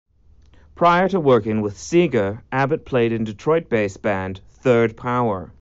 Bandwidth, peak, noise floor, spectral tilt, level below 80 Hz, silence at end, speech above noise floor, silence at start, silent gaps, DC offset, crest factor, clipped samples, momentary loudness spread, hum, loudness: 8 kHz; -4 dBFS; -51 dBFS; -6 dB/octave; -50 dBFS; 0.15 s; 32 dB; 0.75 s; none; under 0.1%; 16 dB; under 0.1%; 7 LU; none; -20 LUFS